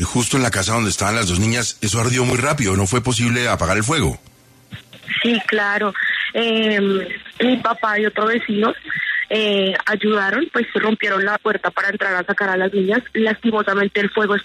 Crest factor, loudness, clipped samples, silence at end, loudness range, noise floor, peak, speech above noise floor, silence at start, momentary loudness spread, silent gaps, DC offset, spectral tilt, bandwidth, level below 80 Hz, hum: 14 dB; -18 LUFS; under 0.1%; 0 s; 1 LU; -40 dBFS; -4 dBFS; 22 dB; 0 s; 3 LU; none; under 0.1%; -4 dB/octave; 13.5 kHz; -44 dBFS; none